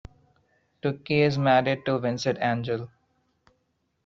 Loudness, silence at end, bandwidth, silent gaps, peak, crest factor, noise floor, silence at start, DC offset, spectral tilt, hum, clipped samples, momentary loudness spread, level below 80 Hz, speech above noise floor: -25 LUFS; 1.2 s; 7.6 kHz; none; -8 dBFS; 20 dB; -74 dBFS; 0.85 s; under 0.1%; -5 dB/octave; none; under 0.1%; 10 LU; -60 dBFS; 49 dB